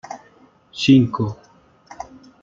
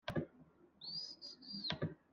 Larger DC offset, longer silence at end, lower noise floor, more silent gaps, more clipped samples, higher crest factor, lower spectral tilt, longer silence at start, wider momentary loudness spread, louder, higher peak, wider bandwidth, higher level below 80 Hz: neither; first, 0.4 s vs 0.15 s; second, -53 dBFS vs -66 dBFS; neither; neither; second, 18 dB vs 24 dB; about the same, -6.5 dB/octave vs -5.5 dB/octave; about the same, 0.1 s vs 0.05 s; first, 24 LU vs 10 LU; first, -17 LUFS vs -45 LUFS; first, -2 dBFS vs -22 dBFS; second, 7.6 kHz vs 11.5 kHz; first, -56 dBFS vs -70 dBFS